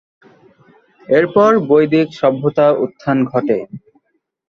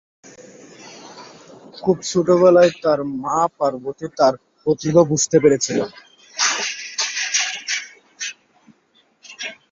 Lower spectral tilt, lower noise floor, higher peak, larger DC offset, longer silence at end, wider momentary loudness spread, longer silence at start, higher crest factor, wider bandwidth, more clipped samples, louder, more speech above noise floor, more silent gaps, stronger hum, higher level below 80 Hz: first, -8 dB/octave vs -3.5 dB/octave; first, -65 dBFS vs -60 dBFS; about the same, -2 dBFS vs -2 dBFS; neither; first, 0.7 s vs 0.15 s; second, 7 LU vs 17 LU; first, 1.1 s vs 0.25 s; about the same, 14 dB vs 18 dB; second, 6.6 kHz vs 7.8 kHz; neither; first, -14 LUFS vs -18 LUFS; first, 51 dB vs 43 dB; neither; neither; about the same, -58 dBFS vs -60 dBFS